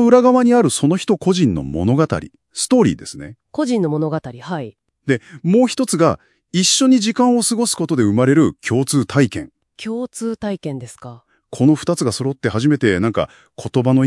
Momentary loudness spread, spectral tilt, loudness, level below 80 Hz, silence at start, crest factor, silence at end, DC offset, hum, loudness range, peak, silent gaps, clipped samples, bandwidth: 16 LU; -5 dB/octave; -17 LUFS; -52 dBFS; 0 s; 16 dB; 0 s; under 0.1%; none; 5 LU; 0 dBFS; none; under 0.1%; 12 kHz